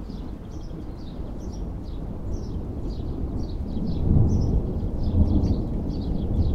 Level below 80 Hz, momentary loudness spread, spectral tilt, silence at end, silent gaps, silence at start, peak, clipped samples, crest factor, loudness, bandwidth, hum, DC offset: -28 dBFS; 14 LU; -9.5 dB/octave; 0 s; none; 0 s; -6 dBFS; under 0.1%; 18 dB; -28 LUFS; 6.6 kHz; none; under 0.1%